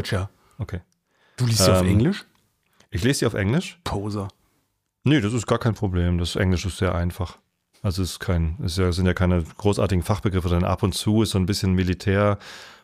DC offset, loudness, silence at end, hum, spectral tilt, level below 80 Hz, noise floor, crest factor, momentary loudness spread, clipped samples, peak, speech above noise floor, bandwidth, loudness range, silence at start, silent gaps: under 0.1%; -23 LUFS; 0.1 s; none; -5.5 dB/octave; -38 dBFS; -71 dBFS; 18 dB; 12 LU; under 0.1%; -4 dBFS; 50 dB; 15.5 kHz; 3 LU; 0 s; none